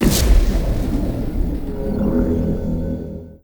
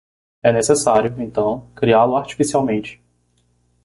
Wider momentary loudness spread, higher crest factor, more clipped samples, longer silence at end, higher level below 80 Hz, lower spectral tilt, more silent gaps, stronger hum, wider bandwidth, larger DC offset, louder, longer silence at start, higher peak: about the same, 9 LU vs 8 LU; about the same, 16 dB vs 16 dB; neither; second, 0.05 s vs 0.9 s; first, -20 dBFS vs -50 dBFS; about the same, -6 dB/octave vs -5 dB/octave; neither; second, none vs 60 Hz at -35 dBFS; first, over 20 kHz vs 11.5 kHz; neither; second, -21 LUFS vs -18 LUFS; second, 0 s vs 0.45 s; about the same, -2 dBFS vs -2 dBFS